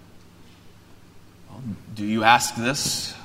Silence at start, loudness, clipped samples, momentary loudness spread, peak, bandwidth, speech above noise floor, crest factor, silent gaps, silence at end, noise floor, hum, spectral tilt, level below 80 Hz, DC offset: 0.15 s; -21 LUFS; under 0.1%; 19 LU; 0 dBFS; 16 kHz; 26 dB; 26 dB; none; 0 s; -48 dBFS; none; -2.5 dB/octave; -56 dBFS; under 0.1%